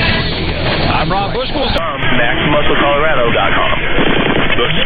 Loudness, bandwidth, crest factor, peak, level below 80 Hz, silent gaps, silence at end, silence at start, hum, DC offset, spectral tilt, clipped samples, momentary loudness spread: -13 LUFS; 5 kHz; 12 dB; 0 dBFS; -22 dBFS; none; 0 s; 0 s; none; under 0.1%; -7.5 dB/octave; under 0.1%; 4 LU